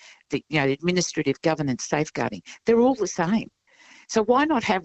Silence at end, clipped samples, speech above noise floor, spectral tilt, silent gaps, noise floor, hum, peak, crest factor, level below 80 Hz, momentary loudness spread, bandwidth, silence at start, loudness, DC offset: 0 s; under 0.1%; 30 dB; -5 dB/octave; none; -53 dBFS; none; -6 dBFS; 18 dB; -58 dBFS; 9 LU; 8.4 kHz; 0.3 s; -24 LUFS; under 0.1%